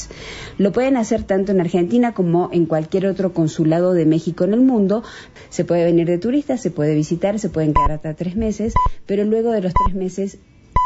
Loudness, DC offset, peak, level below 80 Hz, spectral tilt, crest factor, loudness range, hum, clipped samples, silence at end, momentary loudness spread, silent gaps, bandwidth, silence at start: -18 LUFS; under 0.1%; -2 dBFS; -32 dBFS; -7.5 dB/octave; 16 dB; 2 LU; none; under 0.1%; 0 s; 9 LU; none; 8 kHz; 0 s